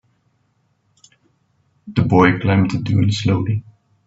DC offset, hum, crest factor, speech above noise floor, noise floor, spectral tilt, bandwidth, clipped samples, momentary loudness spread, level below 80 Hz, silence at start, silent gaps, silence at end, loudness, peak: under 0.1%; none; 20 dB; 48 dB; -64 dBFS; -7 dB/octave; 7.8 kHz; under 0.1%; 10 LU; -50 dBFS; 1.85 s; none; 0.45 s; -17 LUFS; 0 dBFS